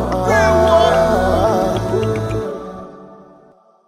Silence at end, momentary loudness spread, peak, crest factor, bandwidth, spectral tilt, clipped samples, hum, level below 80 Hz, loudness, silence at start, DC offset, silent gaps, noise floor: 0.75 s; 18 LU; -2 dBFS; 14 dB; 15.5 kHz; -6 dB/octave; under 0.1%; none; -32 dBFS; -15 LUFS; 0 s; under 0.1%; none; -49 dBFS